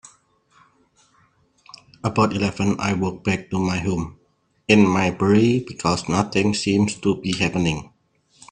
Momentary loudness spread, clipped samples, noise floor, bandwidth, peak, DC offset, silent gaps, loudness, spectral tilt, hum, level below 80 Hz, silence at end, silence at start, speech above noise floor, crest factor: 9 LU; under 0.1%; -61 dBFS; 10 kHz; 0 dBFS; under 0.1%; none; -21 LUFS; -5.5 dB/octave; none; -50 dBFS; 0.7 s; 2.05 s; 41 dB; 22 dB